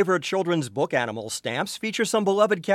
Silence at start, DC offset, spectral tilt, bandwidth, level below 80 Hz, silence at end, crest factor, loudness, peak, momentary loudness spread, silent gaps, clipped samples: 0 s; under 0.1%; -4 dB/octave; 16 kHz; -70 dBFS; 0 s; 18 dB; -24 LUFS; -6 dBFS; 7 LU; none; under 0.1%